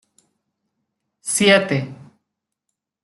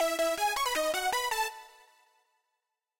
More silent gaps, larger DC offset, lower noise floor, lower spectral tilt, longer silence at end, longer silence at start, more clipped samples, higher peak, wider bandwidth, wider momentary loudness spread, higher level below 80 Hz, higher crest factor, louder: neither; neither; second, -80 dBFS vs -85 dBFS; first, -3.5 dB/octave vs 0 dB/octave; second, 1.1 s vs 1.3 s; first, 1.25 s vs 0 s; neither; first, -2 dBFS vs -20 dBFS; second, 12.5 kHz vs 17 kHz; first, 18 LU vs 6 LU; about the same, -66 dBFS vs -64 dBFS; first, 20 dB vs 12 dB; first, -17 LUFS vs -30 LUFS